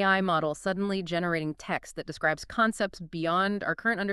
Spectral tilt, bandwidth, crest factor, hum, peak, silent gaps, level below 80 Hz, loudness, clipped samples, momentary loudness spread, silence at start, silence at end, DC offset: -5 dB/octave; 12.5 kHz; 18 dB; none; -10 dBFS; none; -58 dBFS; -29 LUFS; under 0.1%; 7 LU; 0 s; 0 s; under 0.1%